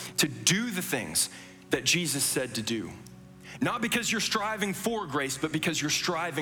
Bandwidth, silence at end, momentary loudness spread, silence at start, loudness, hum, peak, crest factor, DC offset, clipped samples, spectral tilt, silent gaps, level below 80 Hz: over 20 kHz; 0 s; 8 LU; 0 s; -28 LUFS; none; -8 dBFS; 22 dB; under 0.1%; under 0.1%; -2.5 dB/octave; none; -62 dBFS